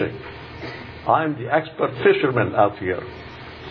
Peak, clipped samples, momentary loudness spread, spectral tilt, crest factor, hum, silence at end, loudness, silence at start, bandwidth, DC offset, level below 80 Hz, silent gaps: -4 dBFS; under 0.1%; 18 LU; -8.5 dB/octave; 18 dB; none; 0 s; -21 LUFS; 0 s; 5.4 kHz; under 0.1%; -50 dBFS; none